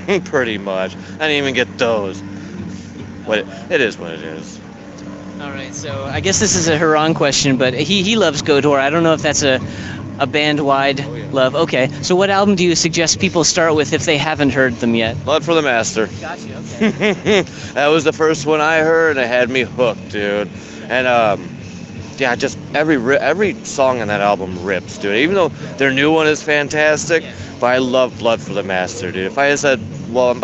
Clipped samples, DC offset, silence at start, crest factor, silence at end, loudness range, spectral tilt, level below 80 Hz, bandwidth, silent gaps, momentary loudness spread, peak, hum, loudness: under 0.1%; under 0.1%; 0 s; 16 dB; 0 s; 6 LU; -4 dB/octave; -48 dBFS; 8.4 kHz; none; 14 LU; 0 dBFS; none; -15 LUFS